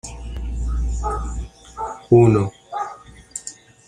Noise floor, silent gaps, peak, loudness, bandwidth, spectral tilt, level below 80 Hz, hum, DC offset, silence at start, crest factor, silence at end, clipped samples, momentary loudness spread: -40 dBFS; none; -2 dBFS; -21 LUFS; 10.5 kHz; -7.5 dB/octave; -30 dBFS; none; under 0.1%; 0.05 s; 20 dB; 0.35 s; under 0.1%; 20 LU